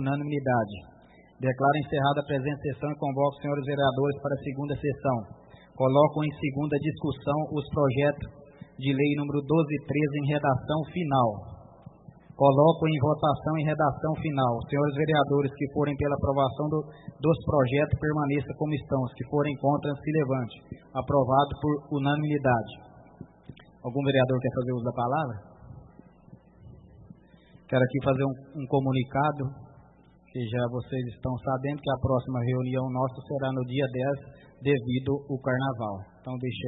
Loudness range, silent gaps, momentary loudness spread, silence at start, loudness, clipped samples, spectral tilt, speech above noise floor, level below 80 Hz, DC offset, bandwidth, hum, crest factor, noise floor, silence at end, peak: 5 LU; none; 10 LU; 0 s; -27 LUFS; under 0.1%; -11.5 dB/octave; 30 dB; -54 dBFS; under 0.1%; 4 kHz; none; 20 dB; -57 dBFS; 0 s; -8 dBFS